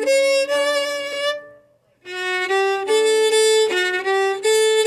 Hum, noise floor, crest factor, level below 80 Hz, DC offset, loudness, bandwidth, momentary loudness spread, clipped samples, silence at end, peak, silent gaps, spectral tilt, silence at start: none; -55 dBFS; 12 dB; -74 dBFS; under 0.1%; -18 LUFS; 16 kHz; 8 LU; under 0.1%; 0 s; -6 dBFS; none; 0 dB/octave; 0 s